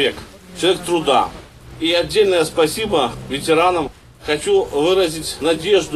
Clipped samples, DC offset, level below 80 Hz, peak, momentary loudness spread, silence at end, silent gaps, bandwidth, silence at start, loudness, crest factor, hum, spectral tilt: under 0.1%; 0.1%; -44 dBFS; -2 dBFS; 8 LU; 0 s; none; 14.5 kHz; 0 s; -17 LUFS; 16 dB; none; -3.5 dB/octave